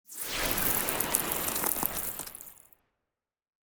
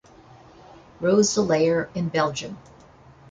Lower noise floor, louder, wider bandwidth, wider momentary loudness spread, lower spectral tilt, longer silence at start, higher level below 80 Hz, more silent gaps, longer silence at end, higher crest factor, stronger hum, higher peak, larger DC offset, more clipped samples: first, -89 dBFS vs -50 dBFS; second, -28 LUFS vs -22 LUFS; first, over 20 kHz vs 9.4 kHz; about the same, 14 LU vs 15 LU; second, -1.5 dB/octave vs -4.5 dB/octave; second, 0.1 s vs 1 s; first, -52 dBFS vs -58 dBFS; neither; first, 1.2 s vs 0.7 s; first, 30 dB vs 18 dB; neither; about the same, -4 dBFS vs -6 dBFS; neither; neither